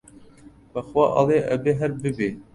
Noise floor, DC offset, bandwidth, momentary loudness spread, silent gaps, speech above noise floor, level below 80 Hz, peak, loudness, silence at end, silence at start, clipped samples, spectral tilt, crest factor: -49 dBFS; under 0.1%; 11.5 kHz; 11 LU; none; 27 dB; -54 dBFS; -6 dBFS; -22 LUFS; 0.1 s; 0.15 s; under 0.1%; -7.5 dB/octave; 18 dB